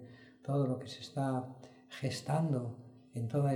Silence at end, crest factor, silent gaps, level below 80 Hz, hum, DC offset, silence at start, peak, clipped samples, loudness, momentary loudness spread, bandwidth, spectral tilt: 0 s; 16 dB; none; -74 dBFS; none; under 0.1%; 0 s; -20 dBFS; under 0.1%; -37 LUFS; 17 LU; 12.5 kHz; -7 dB/octave